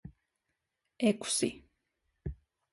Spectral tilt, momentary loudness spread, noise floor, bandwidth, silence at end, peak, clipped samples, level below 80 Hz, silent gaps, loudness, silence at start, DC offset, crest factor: -4 dB/octave; 15 LU; -84 dBFS; 11.5 kHz; 0.4 s; -16 dBFS; under 0.1%; -56 dBFS; none; -32 LUFS; 0.05 s; under 0.1%; 22 dB